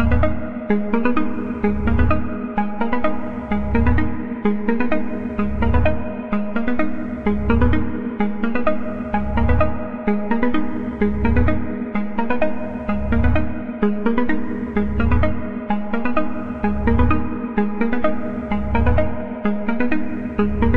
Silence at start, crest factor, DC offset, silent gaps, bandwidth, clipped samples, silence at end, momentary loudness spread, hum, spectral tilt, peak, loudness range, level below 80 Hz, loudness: 0 s; 16 dB; 7%; none; 4.7 kHz; under 0.1%; 0 s; 6 LU; none; -10 dB/octave; -2 dBFS; 1 LU; -28 dBFS; -21 LUFS